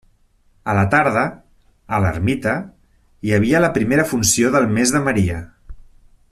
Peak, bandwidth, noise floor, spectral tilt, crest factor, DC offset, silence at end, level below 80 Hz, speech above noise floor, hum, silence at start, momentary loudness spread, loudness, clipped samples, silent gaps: -2 dBFS; 14.5 kHz; -56 dBFS; -5 dB/octave; 16 dB; under 0.1%; 0.5 s; -42 dBFS; 40 dB; none; 0.65 s; 10 LU; -17 LUFS; under 0.1%; none